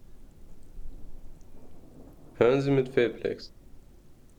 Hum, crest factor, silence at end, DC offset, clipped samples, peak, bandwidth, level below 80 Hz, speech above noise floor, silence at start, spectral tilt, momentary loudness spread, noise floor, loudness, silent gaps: none; 22 dB; 0.25 s; under 0.1%; under 0.1%; -10 dBFS; 10 kHz; -48 dBFS; 26 dB; 0 s; -7.5 dB/octave; 26 LU; -52 dBFS; -26 LUFS; none